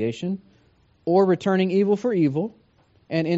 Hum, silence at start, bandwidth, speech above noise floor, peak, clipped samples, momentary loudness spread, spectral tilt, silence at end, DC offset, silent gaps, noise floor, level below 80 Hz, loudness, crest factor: none; 0 s; 8 kHz; 38 dB; -6 dBFS; under 0.1%; 13 LU; -6.5 dB/octave; 0 s; under 0.1%; none; -59 dBFS; -66 dBFS; -22 LUFS; 16 dB